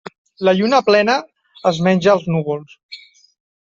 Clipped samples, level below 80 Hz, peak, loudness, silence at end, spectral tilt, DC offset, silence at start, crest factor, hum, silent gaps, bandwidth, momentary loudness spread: under 0.1%; -60 dBFS; -2 dBFS; -16 LUFS; 0.7 s; -6 dB/octave; under 0.1%; 0.4 s; 16 dB; none; 2.83-2.89 s; 7.6 kHz; 23 LU